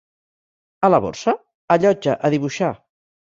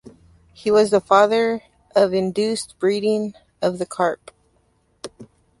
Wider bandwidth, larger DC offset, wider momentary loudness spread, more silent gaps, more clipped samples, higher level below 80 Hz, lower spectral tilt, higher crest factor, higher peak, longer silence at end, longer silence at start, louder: second, 7.8 kHz vs 11.5 kHz; neither; second, 8 LU vs 19 LU; first, 1.55-1.68 s vs none; neither; about the same, -56 dBFS vs -60 dBFS; first, -6.5 dB/octave vs -5 dB/octave; about the same, 20 dB vs 18 dB; about the same, -2 dBFS vs -2 dBFS; first, 0.6 s vs 0.35 s; first, 0.8 s vs 0.05 s; about the same, -19 LUFS vs -20 LUFS